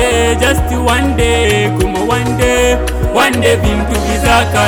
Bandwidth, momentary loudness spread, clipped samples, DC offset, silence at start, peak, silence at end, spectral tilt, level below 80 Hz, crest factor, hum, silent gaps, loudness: 19.5 kHz; 4 LU; under 0.1%; under 0.1%; 0 s; -2 dBFS; 0 s; -4.5 dB/octave; -20 dBFS; 8 dB; none; none; -12 LUFS